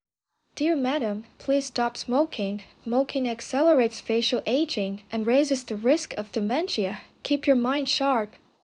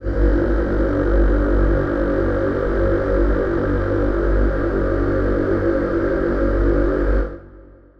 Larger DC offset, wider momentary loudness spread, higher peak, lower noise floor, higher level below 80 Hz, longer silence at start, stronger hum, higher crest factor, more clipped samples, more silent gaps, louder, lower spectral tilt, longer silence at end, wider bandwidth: neither; first, 8 LU vs 2 LU; second, -10 dBFS vs -6 dBFS; first, -74 dBFS vs -43 dBFS; second, -66 dBFS vs -22 dBFS; first, 0.55 s vs 0 s; second, none vs 50 Hz at -30 dBFS; about the same, 16 dB vs 12 dB; neither; neither; second, -26 LUFS vs -19 LUFS; second, -4 dB/octave vs -10 dB/octave; about the same, 0.35 s vs 0.35 s; first, 11 kHz vs 5.2 kHz